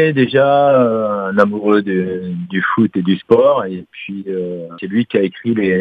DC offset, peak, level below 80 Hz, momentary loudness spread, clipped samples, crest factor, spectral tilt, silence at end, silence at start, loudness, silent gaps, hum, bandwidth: under 0.1%; 0 dBFS; -58 dBFS; 13 LU; under 0.1%; 14 dB; -9 dB/octave; 0 s; 0 s; -15 LUFS; none; none; 5.4 kHz